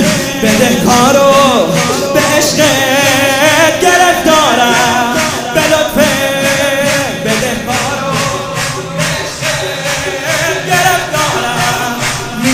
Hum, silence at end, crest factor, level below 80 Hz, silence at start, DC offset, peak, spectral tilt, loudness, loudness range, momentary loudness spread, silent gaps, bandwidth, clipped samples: none; 0 s; 10 dB; -38 dBFS; 0 s; under 0.1%; 0 dBFS; -3 dB/octave; -10 LUFS; 6 LU; 7 LU; none; 16.5 kHz; 0.2%